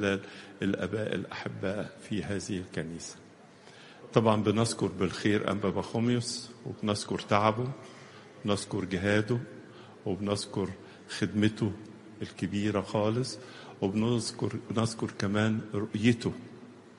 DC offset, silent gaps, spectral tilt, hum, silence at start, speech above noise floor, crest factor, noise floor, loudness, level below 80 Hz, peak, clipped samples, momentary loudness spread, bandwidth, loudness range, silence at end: under 0.1%; none; -5.5 dB/octave; none; 0 s; 23 dB; 24 dB; -54 dBFS; -31 LUFS; -64 dBFS; -8 dBFS; under 0.1%; 18 LU; 11.5 kHz; 4 LU; 0.1 s